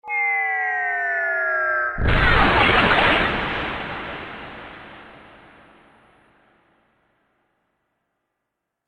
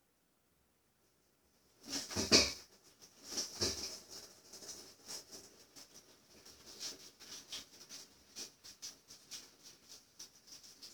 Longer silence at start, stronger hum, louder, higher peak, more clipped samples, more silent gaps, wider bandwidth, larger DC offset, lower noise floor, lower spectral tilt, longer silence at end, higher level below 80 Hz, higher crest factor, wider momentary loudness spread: second, 0.05 s vs 1.8 s; neither; first, -19 LUFS vs -38 LUFS; first, -4 dBFS vs -12 dBFS; neither; neither; second, 10 kHz vs over 20 kHz; neither; about the same, -80 dBFS vs -77 dBFS; first, -6 dB/octave vs -1.5 dB/octave; first, 3.7 s vs 0 s; first, -34 dBFS vs -68 dBFS; second, 20 dB vs 32 dB; about the same, 21 LU vs 21 LU